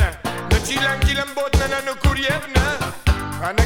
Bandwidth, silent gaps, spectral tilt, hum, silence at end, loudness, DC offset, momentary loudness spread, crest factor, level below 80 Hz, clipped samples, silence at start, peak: 17.5 kHz; none; -4.5 dB/octave; none; 0 s; -20 LUFS; under 0.1%; 4 LU; 18 dB; -24 dBFS; under 0.1%; 0 s; -2 dBFS